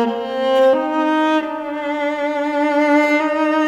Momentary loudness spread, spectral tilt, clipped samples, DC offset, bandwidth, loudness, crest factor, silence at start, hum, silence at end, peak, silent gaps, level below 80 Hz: 7 LU; -4 dB/octave; under 0.1%; under 0.1%; 9.4 kHz; -17 LUFS; 12 dB; 0 s; 50 Hz at -60 dBFS; 0 s; -4 dBFS; none; -64 dBFS